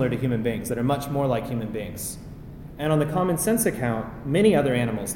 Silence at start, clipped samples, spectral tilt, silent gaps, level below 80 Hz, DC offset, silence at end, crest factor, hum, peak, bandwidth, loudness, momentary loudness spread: 0 s; under 0.1%; -5.5 dB/octave; none; -46 dBFS; under 0.1%; 0 s; 18 dB; none; -6 dBFS; 17 kHz; -24 LUFS; 13 LU